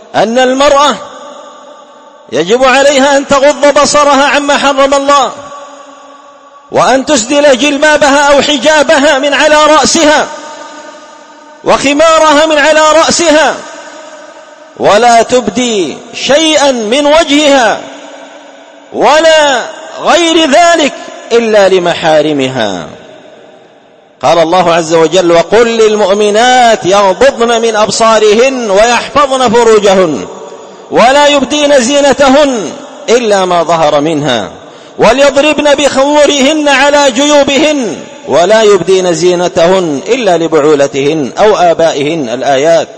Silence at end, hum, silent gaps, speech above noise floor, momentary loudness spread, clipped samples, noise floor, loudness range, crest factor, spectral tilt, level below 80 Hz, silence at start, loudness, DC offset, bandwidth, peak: 0 s; none; none; 34 dB; 10 LU; 2%; -40 dBFS; 3 LU; 8 dB; -3 dB/octave; -40 dBFS; 0.15 s; -6 LUFS; under 0.1%; 11 kHz; 0 dBFS